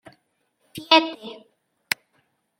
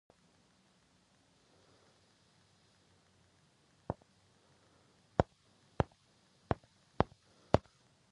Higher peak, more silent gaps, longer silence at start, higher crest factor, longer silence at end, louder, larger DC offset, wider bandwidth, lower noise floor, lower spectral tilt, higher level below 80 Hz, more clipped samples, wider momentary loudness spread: first, -2 dBFS vs -6 dBFS; neither; second, 0.75 s vs 3.9 s; second, 26 dB vs 36 dB; first, 1.25 s vs 0.55 s; first, -21 LUFS vs -38 LUFS; neither; first, 16.5 kHz vs 11 kHz; about the same, -70 dBFS vs -70 dBFS; second, -2 dB/octave vs -7.5 dB/octave; second, -74 dBFS vs -54 dBFS; neither; first, 23 LU vs 12 LU